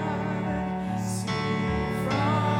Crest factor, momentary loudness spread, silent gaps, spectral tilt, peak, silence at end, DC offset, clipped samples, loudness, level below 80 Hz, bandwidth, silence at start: 12 dB; 5 LU; none; -6 dB/octave; -14 dBFS; 0 s; under 0.1%; under 0.1%; -28 LUFS; -44 dBFS; 16.5 kHz; 0 s